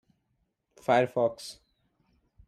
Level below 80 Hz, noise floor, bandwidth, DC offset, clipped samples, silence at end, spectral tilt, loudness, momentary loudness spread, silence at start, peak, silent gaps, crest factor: -70 dBFS; -77 dBFS; 14 kHz; under 0.1%; under 0.1%; 0.95 s; -5.5 dB/octave; -27 LUFS; 18 LU; 0.9 s; -12 dBFS; none; 20 dB